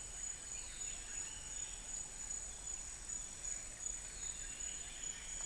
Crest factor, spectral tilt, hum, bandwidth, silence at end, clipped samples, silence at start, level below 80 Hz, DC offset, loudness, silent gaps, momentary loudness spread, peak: 16 dB; 0 dB/octave; none; 10.5 kHz; 0 s; under 0.1%; 0 s; -56 dBFS; under 0.1%; -44 LUFS; none; 1 LU; -30 dBFS